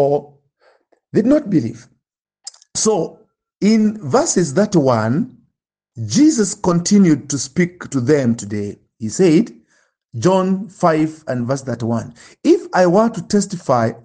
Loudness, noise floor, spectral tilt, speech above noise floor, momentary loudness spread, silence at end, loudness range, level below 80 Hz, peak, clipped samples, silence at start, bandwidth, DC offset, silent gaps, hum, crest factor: -17 LUFS; -73 dBFS; -5.5 dB/octave; 57 dB; 12 LU; 0.1 s; 3 LU; -54 dBFS; -2 dBFS; under 0.1%; 0 s; 10 kHz; under 0.1%; none; none; 16 dB